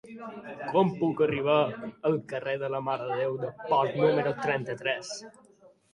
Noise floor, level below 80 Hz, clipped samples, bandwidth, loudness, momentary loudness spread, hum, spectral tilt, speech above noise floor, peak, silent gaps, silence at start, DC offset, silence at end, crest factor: -59 dBFS; -70 dBFS; under 0.1%; 11 kHz; -28 LUFS; 13 LU; none; -6 dB/octave; 30 dB; -12 dBFS; none; 0.05 s; under 0.1%; 0.65 s; 18 dB